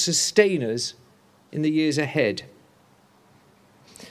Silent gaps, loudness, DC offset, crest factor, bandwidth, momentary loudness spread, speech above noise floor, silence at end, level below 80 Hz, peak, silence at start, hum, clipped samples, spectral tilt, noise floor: none; -23 LUFS; under 0.1%; 24 dB; 14 kHz; 12 LU; 35 dB; 0 s; -68 dBFS; -2 dBFS; 0 s; none; under 0.1%; -3.5 dB/octave; -57 dBFS